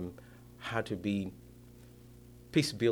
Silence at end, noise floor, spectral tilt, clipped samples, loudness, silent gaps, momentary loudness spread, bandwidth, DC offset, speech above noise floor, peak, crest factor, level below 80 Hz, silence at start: 0 s; -54 dBFS; -5.5 dB/octave; under 0.1%; -35 LUFS; none; 24 LU; over 20 kHz; under 0.1%; 23 dB; -14 dBFS; 22 dB; -62 dBFS; 0 s